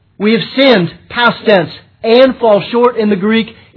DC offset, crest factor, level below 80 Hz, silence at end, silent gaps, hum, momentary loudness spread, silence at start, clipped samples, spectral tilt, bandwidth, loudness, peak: under 0.1%; 12 dB; -52 dBFS; 0.25 s; none; none; 6 LU; 0.2 s; 0.4%; -8 dB/octave; 5.4 kHz; -11 LUFS; 0 dBFS